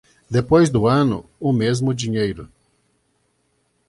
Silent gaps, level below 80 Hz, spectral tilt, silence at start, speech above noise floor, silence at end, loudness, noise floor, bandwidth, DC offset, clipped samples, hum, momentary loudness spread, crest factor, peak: none; -46 dBFS; -6.5 dB/octave; 0.3 s; 48 dB; 1.45 s; -19 LUFS; -66 dBFS; 11.5 kHz; under 0.1%; under 0.1%; none; 9 LU; 18 dB; -2 dBFS